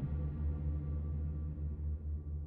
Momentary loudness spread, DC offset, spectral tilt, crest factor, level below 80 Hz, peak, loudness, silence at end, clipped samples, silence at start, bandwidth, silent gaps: 3 LU; under 0.1%; -12.5 dB/octave; 10 dB; -42 dBFS; -28 dBFS; -40 LUFS; 0 s; under 0.1%; 0 s; 2.5 kHz; none